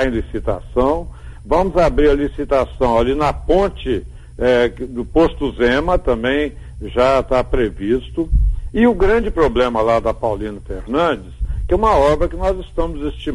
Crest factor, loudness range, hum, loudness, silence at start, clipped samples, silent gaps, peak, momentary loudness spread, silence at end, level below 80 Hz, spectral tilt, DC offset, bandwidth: 14 dB; 1 LU; none; -17 LUFS; 0 s; under 0.1%; none; -4 dBFS; 10 LU; 0 s; -24 dBFS; -7 dB/octave; under 0.1%; 11.5 kHz